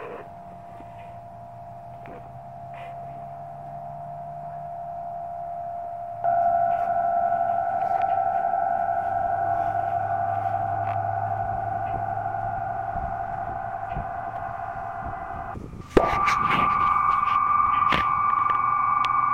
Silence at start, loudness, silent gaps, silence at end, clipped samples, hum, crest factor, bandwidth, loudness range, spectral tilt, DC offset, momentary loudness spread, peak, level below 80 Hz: 0 s; -25 LUFS; none; 0 s; under 0.1%; none; 20 dB; 9.8 kHz; 16 LU; -6 dB/octave; 0.2%; 20 LU; -6 dBFS; -46 dBFS